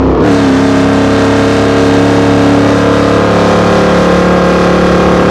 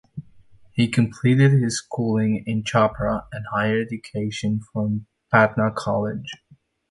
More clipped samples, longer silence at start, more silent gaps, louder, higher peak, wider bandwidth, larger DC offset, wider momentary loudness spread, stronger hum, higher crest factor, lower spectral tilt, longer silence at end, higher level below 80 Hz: first, 1% vs under 0.1%; second, 0 s vs 0.15 s; neither; first, -8 LUFS vs -22 LUFS; about the same, 0 dBFS vs -2 dBFS; about the same, 12 kHz vs 11.5 kHz; neither; second, 1 LU vs 13 LU; neither; second, 8 dB vs 20 dB; about the same, -6.5 dB/octave vs -6.5 dB/octave; second, 0 s vs 0.55 s; first, -24 dBFS vs -50 dBFS